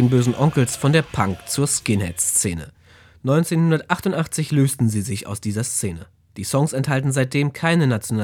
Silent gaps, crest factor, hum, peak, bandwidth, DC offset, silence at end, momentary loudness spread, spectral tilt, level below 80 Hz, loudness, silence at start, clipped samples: none; 20 dB; none; 0 dBFS; 18 kHz; under 0.1%; 0 s; 9 LU; -5 dB/octave; -50 dBFS; -20 LUFS; 0 s; under 0.1%